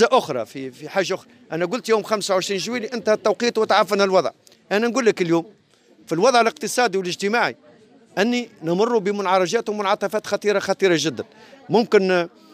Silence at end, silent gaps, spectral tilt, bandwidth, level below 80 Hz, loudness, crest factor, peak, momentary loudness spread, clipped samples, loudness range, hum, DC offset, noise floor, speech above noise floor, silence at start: 0.25 s; none; -4 dB/octave; 16 kHz; -74 dBFS; -21 LUFS; 16 dB; -4 dBFS; 10 LU; under 0.1%; 2 LU; none; under 0.1%; -54 dBFS; 34 dB; 0 s